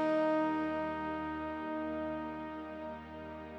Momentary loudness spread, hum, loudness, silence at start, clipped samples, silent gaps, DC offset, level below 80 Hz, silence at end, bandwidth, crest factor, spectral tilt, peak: 13 LU; none; -37 LUFS; 0 s; under 0.1%; none; under 0.1%; -62 dBFS; 0 s; 7.2 kHz; 16 dB; -7.5 dB/octave; -22 dBFS